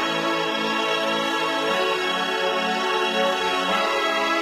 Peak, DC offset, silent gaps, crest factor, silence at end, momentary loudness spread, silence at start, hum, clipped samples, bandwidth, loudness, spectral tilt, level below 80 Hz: -8 dBFS; under 0.1%; none; 14 dB; 0 s; 2 LU; 0 s; none; under 0.1%; 16 kHz; -22 LUFS; -2.5 dB/octave; -64 dBFS